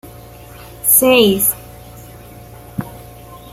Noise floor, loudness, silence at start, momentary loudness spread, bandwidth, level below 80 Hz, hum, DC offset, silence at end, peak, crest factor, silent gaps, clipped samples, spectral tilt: -37 dBFS; -11 LUFS; 0.05 s; 20 LU; 16.5 kHz; -44 dBFS; none; under 0.1%; 0 s; 0 dBFS; 18 dB; none; under 0.1%; -3 dB/octave